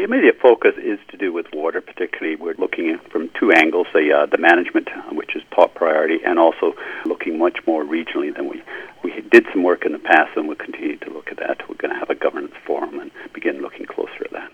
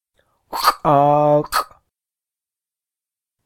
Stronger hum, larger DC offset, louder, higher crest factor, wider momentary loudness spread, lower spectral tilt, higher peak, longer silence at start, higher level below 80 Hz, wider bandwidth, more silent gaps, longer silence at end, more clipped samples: neither; neither; about the same, -18 LUFS vs -16 LUFS; about the same, 18 dB vs 20 dB; about the same, 15 LU vs 13 LU; about the same, -5 dB/octave vs -5 dB/octave; about the same, 0 dBFS vs 0 dBFS; second, 0 s vs 0.5 s; second, -64 dBFS vs -50 dBFS; second, 8.4 kHz vs 18 kHz; neither; second, 0.05 s vs 1.8 s; neither